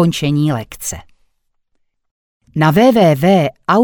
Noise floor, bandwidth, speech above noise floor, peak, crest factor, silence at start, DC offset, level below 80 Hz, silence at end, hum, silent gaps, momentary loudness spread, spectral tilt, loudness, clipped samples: -64 dBFS; over 20 kHz; 52 dB; 0 dBFS; 14 dB; 0 s; under 0.1%; -46 dBFS; 0 s; none; 2.11-2.40 s; 15 LU; -6 dB/octave; -13 LUFS; under 0.1%